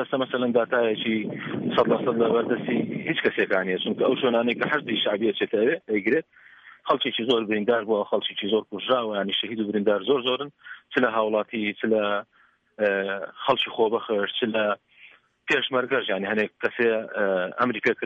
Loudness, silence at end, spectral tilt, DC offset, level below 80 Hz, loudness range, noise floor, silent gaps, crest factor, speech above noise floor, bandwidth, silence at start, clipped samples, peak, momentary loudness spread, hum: -24 LUFS; 0 s; -6.5 dB/octave; under 0.1%; -70 dBFS; 2 LU; -53 dBFS; none; 16 dB; 29 dB; 7.6 kHz; 0 s; under 0.1%; -8 dBFS; 5 LU; none